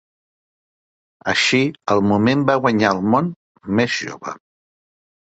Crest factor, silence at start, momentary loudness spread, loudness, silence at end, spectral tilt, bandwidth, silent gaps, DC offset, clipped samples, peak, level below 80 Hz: 18 dB; 1.25 s; 15 LU; -18 LUFS; 1.05 s; -5 dB/octave; 8.2 kHz; 3.36-3.55 s; under 0.1%; under 0.1%; -2 dBFS; -54 dBFS